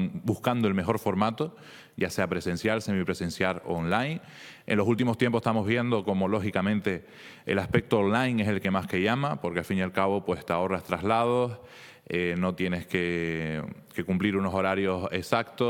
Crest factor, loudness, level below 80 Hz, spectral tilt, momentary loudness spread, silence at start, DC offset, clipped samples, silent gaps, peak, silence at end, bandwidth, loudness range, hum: 20 dB; -28 LUFS; -60 dBFS; -6.5 dB/octave; 9 LU; 0 s; under 0.1%; under 0.1%; none; -6 dBFS; 0 s; 17 kHz; 2 LU; none